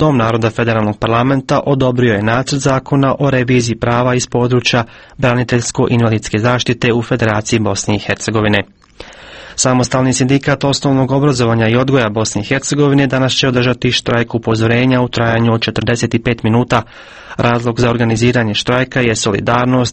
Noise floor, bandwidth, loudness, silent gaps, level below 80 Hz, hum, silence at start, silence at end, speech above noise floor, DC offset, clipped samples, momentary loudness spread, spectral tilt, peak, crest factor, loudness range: -35 dBFS; 8.8 kHz; -13 LUFS; none; -38 dBFS; none; 0 s; 0 s; 22 dB; under 0.1%; under 0.1%; 4 LU; -5 dB/octave; 0 dBFS; 14 dB; 2 LU